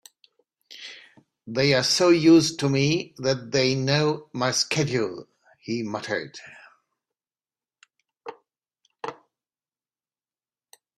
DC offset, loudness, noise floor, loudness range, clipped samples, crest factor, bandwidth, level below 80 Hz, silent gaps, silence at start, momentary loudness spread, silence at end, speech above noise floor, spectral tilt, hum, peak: under 0.1%; -22 LUFS; under -90 dBFS; 24 LU; under 0.1%; 20 dB; 13 kHz; -64 dBFS; none; 0.7 s; 24 LU; 1.85 s; over 68 dB; -4.5 dB/octave; none; -6 dBFS